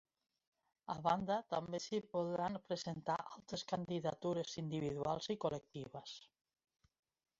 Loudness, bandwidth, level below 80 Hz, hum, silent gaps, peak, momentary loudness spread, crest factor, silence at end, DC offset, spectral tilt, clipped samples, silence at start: -42 LUFS; 7.6 kHz; -74 dBFS; none; none; -22 dBFS; 12 LU; 20 dB; 1.15 s; under 0.1%; -5 dB/octave; under 0.1%; 0.9 s